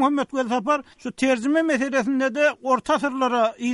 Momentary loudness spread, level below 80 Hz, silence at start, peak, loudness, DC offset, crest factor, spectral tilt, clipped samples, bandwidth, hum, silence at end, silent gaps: 4 LU; -62 dBFS; 0 s; -6 dBFS; -22 LUFS; under 0.1%; 16 dB; -4 dB/octave; under 0.1%; 11.5 kHz; none; 0 s; none